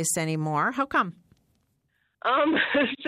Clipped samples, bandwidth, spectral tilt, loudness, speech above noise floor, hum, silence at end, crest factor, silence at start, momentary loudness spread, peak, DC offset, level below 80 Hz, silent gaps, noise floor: under 0.1%; 15.5 kHz; -4 dB/octave; -25 LUFS; 47 dB; none; 0 s; 16 dB; 0 s; 5 LU; -12 dBFS; under 0.1%; -66 dBFS; none; -72 dBFS